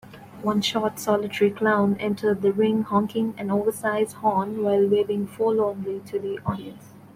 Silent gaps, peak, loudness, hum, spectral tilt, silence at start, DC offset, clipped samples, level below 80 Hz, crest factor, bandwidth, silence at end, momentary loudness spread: none; -8 dBFS; -24 LUFS; none; -5.5 dB/octave; 0.05 s; under 0.1%; under 0.1%; -60 dBFS; 16 dB; 16 kHz; 0.1 s; 9 LU